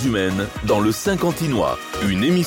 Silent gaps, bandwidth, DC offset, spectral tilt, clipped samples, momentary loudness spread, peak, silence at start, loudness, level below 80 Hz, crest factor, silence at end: none; 17 kHz; under 0.1%; -5.5 dB/octave; under 0.1%; 5 LU; -6 dBFS; 0 s; -20 LUFS; -40 dBFS; 12 dB; 0 s